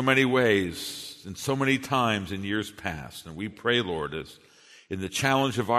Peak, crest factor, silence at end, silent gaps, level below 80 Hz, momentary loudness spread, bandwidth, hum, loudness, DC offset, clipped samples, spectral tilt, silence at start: -6 dBFS; 20 dB; 0 s; none; -56 dBFS; 16 LU; 13.5 kHz; none; -27 LUFS; under 0.1%; under 0.1%; -4.5 dB/octave; 0 s